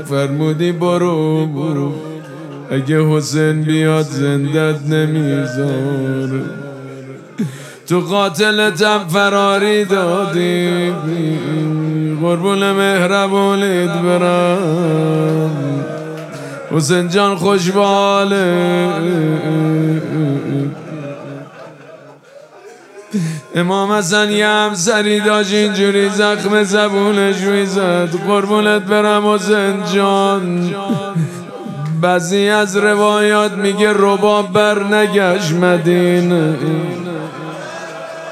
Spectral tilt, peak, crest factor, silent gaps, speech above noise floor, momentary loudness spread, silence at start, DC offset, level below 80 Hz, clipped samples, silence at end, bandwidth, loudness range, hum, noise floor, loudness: -5.5 dB/octave; 0 dBFS; 14 dB; none; 26 dB; 12 LU; 0 s; under 0.1%; -66 dBFS; under 0.1%; 0 s; 14.5 kHz; 5 LU; none; -40 dBFS; -14 LUFS